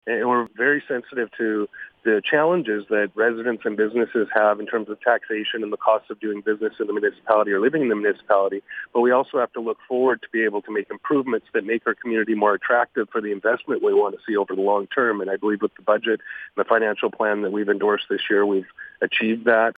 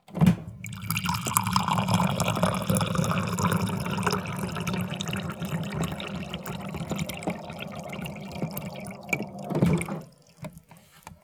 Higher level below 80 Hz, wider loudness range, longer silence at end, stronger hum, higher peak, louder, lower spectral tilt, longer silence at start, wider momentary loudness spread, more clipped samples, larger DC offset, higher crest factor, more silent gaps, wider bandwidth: second, -74 dBFS vs -50 dBFS; second, 1 LU vs 8 LU; about the same, 0.05 s vs 0.1 s; neither; about the same, 0 dBFS vs 0 dBFS; first, -22 LUFS vs -29 LUFS; first, -7.5 dB/octave vs -5 dB/octave; about the same, 0.05 s vs 0.1 s; second, 7 LU vs 13 LU; neither; neither; second, 22 dB vs 28 dB; neither; second, 4.6 kHz vs over 20 kHz